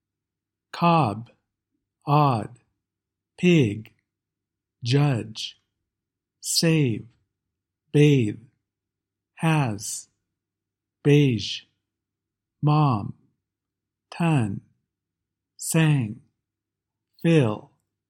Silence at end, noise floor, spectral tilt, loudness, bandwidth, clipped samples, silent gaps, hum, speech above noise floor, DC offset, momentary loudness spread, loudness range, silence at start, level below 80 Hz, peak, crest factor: 0.5 s; -87 dBFS; -6 dB/octave; -23 LUFS; 16 kHz; under 0.1%; none; none; 66 dB; under 0.1%; 17 LU; 3 LU; 0.75 s; -66 dBFS; -6 dBFS; 20 dB